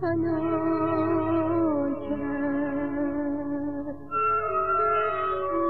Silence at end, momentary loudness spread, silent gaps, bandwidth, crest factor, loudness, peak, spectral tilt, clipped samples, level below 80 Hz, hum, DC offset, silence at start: 0 s; 6 LU; none; 4.6 kHz; 12 dB; -26 LUFS; -14 dBFS; -10 dB/octave; under 0.1%; -54 dBFS; none; 0.7%; 0 s